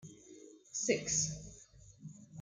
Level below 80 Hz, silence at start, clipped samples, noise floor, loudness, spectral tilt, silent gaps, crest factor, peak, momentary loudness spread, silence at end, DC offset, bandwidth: -64 dBFS; 0.05 s; under 0.1%; -59 dBFS; -35 LUFS; -2.5 dB/octave; none; 22 dB; -18 dBFS; 24 LU; 0 s; under 0.1%; 10.5 kHz